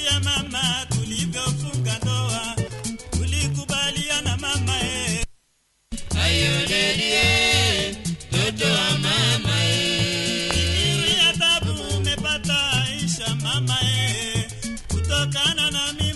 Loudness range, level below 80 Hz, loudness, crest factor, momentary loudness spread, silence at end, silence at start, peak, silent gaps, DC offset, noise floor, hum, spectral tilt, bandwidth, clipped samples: 5 LU; -36 dBFS; -21 LUFS; 20 dB; 10 LU; 0 s; 0 s; -4 dBFS; none; under 0.1%; -66 dBFS; none; -3 dB/octave; 12 kHz; under 0.1%